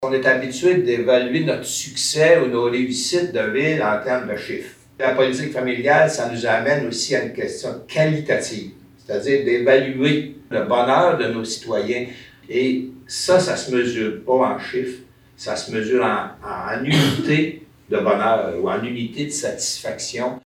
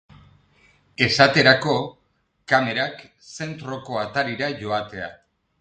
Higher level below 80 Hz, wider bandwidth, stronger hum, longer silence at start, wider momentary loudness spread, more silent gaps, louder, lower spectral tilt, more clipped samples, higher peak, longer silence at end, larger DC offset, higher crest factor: about the same, -58 dBFS vs -56 dBFS; first, 16.5 kHz vs 9.2 kHz; neither; second, 0 s vs 1 s; second, 11 LU vs 19 LU; neither; about the same, -20 LUFS vs -20 LUFS; about the same, -4.5 dB/octave vs -4.5 dB/octave; neither; about the same, -2 dBFS vs 0 dBFS; second, 0.05 s vs 0.5 s; neither; about the same, 18 dB vs 22 dB